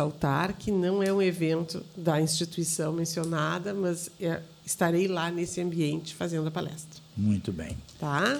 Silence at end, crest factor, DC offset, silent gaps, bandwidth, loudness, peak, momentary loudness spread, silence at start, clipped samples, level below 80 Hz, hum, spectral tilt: 0 s; 18 dB; under 0.1%; none; 19 kHz; -29 LUFS; -10 dBFS; 10 LU; 0 s; under 0.1%; -56 dBFS; none; -5 dB/octave